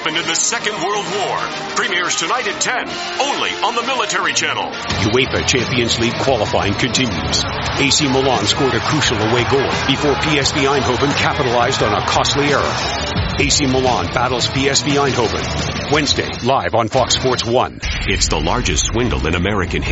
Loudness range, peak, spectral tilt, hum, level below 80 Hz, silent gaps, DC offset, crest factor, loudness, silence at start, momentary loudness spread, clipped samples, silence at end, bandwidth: 2 LU; 0 dBFS; -3.5 dB/octave; none; -32 dBFS; none; under 0.1%; 16 dB; -16 LUFS; 0 s; 5 LU; under 0.1%; 0 s; 8.2 kHz